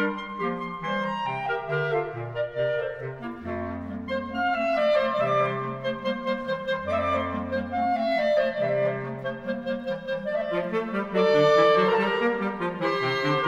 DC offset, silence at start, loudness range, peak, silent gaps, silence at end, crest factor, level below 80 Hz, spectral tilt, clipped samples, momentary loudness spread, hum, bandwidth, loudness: under 0.1%; 0 s; 6 LU; -8 dBFS; none; 0 s; 18 dB; -56 dBFS; -6.5 dB/octave; under 0.1%; 10 LU; none; 8 kHz; -26 LUFS